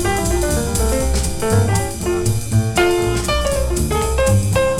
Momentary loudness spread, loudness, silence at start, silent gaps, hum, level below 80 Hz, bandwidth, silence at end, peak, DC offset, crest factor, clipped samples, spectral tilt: 4 LU; -18 LUFS; 0 s; none; none; -24 dBFS; 17 kHz; 0 s; -4 dBFS; under 0.1%; 14 dB; under 0.1%; -5 dB/octave